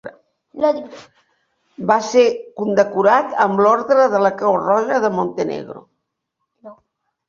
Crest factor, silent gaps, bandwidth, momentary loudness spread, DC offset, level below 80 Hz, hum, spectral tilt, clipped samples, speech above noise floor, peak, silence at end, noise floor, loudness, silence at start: 16 dB; none; 7.4 kHz; 12 LU; under 0.1%; -64 dBFS; none; -5.5 dB/octave; under 0.1%; 60 dB; -2 dBFS; 0.55 s; -76 dBFS; -17 LUFS; 0.05 s